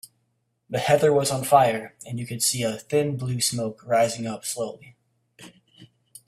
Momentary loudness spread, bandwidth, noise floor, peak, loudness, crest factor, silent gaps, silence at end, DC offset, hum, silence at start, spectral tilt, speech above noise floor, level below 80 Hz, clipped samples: 13 LU; 15.5 kHz; -73 dBFS; -4 dBFS; -23 LUFS; 22 dB; none; 0.4 s; under 0.1%; none; 0.7 s; -4 dB/octave; 49 dB; -64 dBFS; under 0.1%